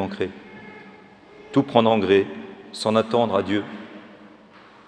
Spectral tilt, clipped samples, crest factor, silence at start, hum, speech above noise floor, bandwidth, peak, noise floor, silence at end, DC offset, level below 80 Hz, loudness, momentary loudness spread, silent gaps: -6 dB/octave; under 0.1%; 24 dB; 0 s; none; 28 dB; 10.5 kHz; 0 dBFS; -49 dBFS; 0.6 s; under 0.1%; -66 dBFS; -21 LUFS; 23 LU; none